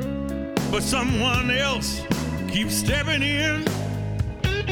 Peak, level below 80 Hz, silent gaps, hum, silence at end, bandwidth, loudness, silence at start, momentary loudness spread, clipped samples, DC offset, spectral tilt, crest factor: -8 dBFS; -36 dBFS; none; none; 0 s; 17 kHz; -23 LUFS; 0 s; 7 LU; under 0.1%; under 0.1%; -4 dB/octave; 16 dB